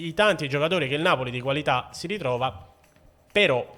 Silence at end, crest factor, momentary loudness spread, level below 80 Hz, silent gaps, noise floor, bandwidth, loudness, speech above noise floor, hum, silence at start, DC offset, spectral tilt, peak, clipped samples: 0 s; 18 dB; 7 LU; -58 dBFS; none; -57 dBFS; 18.5 kHz; -24 LUFS; 32 dB; none; 0 s; under 0.1%; -5 dB/octave; -6 dBFS; under 0.1%